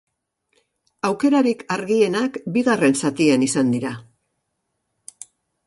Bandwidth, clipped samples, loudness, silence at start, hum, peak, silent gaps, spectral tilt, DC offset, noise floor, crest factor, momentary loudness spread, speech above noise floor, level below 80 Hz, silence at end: 11.5 kHz; under 0.1%; -20 LUFS; 1.05 s; none; -4 dBFS; none; -5 dB/octave; under 0.1%; -75 dBFS; 18 dB; 11 LU; 56 dB; -64 dBFS; 1.65 s